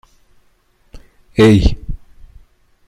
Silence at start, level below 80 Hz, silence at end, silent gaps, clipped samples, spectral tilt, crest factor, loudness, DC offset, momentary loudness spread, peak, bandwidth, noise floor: 0.95 s; -26 dBFS; 0.9 s; none; under 0.1%; -7 dB/octave; 16 dB; -13 LUFS; under 0.1%; 24 LU; -2 dBFS; 14 kHz; -56 dBFS